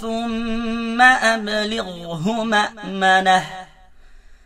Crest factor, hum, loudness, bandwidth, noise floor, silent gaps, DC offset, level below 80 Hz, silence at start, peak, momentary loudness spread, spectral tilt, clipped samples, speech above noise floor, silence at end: 20 dB; none; -18 LUFS; 15 kHz; -45 dBFS; none; under 0.1%; -42 dBFS; 0 s; 0 dBFS; 13 LU; -3.5 dB/octave; under 0.1%; 26 dB; 0.1 s